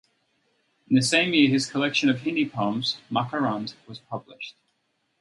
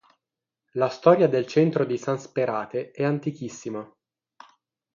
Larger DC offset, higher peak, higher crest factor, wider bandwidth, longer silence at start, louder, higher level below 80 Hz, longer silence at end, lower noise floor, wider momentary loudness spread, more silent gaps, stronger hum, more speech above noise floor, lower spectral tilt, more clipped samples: neither; about the same, -6 dBFS vs -4 dBFS; about the same, 20 dB vs 22 dB; first, 11.5 kHz vs 7.4 kHz; first, 0.9 s vs 0.75 s; about the same, -23 LUFS vs -24 LUFS; about the same, -68 dBFS vs -72 dBFS; second, 0.7 s vs 1.1 s; second, -73 dBFS vs -87 dBFS; about the same, 18 LU vs 16 LU; neither; neither; second, 49 dB vs 64 dB; second, -4.5 dB/octave vs -7 dB/octave; neither